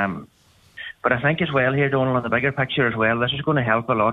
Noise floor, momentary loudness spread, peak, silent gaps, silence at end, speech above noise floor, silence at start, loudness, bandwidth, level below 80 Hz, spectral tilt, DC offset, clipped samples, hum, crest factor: -44 dBFS; 7 LU; -4 dBFS; none; 0 s; 23 dB; 0 s; -21 LUFS; 4.7 kHz; -52 dBFS; -8 dB/octave; under 0.1%; under 0.1%; none; 18 dB